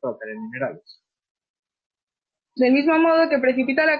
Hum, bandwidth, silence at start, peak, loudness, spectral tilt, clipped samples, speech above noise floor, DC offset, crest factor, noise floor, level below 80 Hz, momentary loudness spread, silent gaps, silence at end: none; 5.2 kHz; 0 s; -8 dBFS; -20 LUFS; -8 dB/octave; under 0.1%; 65 dB; under 0.1%; 14 dB; -85 dBFS; -68 dBFS; 15 LU; 1.30-1.35 s, 1.49-1.63 s, 1.86-1.90 s, 2.03-2.07 s; 0 s